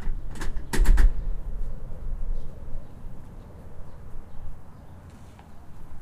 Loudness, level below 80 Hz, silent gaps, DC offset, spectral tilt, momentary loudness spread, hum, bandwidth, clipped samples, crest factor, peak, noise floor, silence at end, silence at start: -31 LUFS; -26 dBFS; none; under 0.1%; -5.5 dB/octave; 22 LU; none; 12.5 kHz; under 0.1%; 18 dB; -6 dBFS; -45 dBFS; 0 s; 0 s